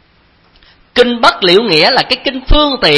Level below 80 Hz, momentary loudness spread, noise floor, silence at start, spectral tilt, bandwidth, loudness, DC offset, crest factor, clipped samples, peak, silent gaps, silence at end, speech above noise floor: -22 dBFS; 6 LU; -50 dBFS; 0.95 s; -4.5 dB/octave; 11 kHz; -10 LUFS; under 0.1%; 12 dB; 0.8%; 0 dBFS; none; 0 s; 40 dB